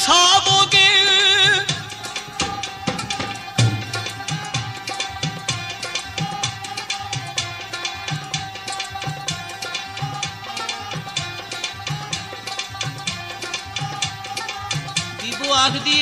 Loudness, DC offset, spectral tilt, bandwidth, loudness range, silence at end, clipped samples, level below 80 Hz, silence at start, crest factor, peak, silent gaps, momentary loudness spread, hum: -20 LUFS; under 0.1%; -2 dB/octave; 15.5 kHz; 10 LU; 0 s; under 0.1%; -52 dBFS; 0 s; 20 dB; -2 dBFS; none; 15 LU; none